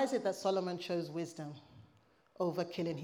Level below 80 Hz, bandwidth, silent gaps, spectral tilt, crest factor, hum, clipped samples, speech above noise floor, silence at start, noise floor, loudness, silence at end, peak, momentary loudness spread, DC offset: -82 dBFS; 17.5 kHz; none; -5.5 dB/octave; 16 dB; none; under 0.1%; 32 dB; 0 s; -69 dBFS; -38 LUFS; 0 s; -22 dBFS; 13 LU; under 0.1%